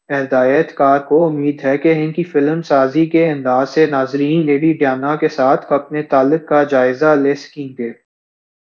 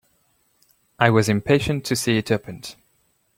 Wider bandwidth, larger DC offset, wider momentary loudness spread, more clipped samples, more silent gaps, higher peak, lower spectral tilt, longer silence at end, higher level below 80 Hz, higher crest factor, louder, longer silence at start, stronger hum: second, 7 kHz vs 16.5 kHz; neither; second, 5 LU vs 18 LU; neither; neither; about the same, 0 dBFS vs -2 dBFS; first, -8 dB/octave vs -5 dB/octave; about the same, 0.7 s vs 0.65 s; second, -66 dBFS vs -50 dBFS; second, 14 dB vs 20 dB; first, -15 LUFS vs -20 LUFS; second, 0.1 s vs 1 s; neither